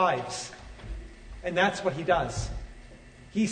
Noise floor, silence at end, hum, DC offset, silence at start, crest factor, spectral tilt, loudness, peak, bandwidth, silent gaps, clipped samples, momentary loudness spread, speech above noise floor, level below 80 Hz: -49 dBFS; 0 s; none; under 0.1%; 0 s; 20 dB; -4.5 dB/octave; -29 LUFS; -10 dBFS; 9.6 kHz; none; under 0.1%; 22 LU; 22 dB; -44 dBFS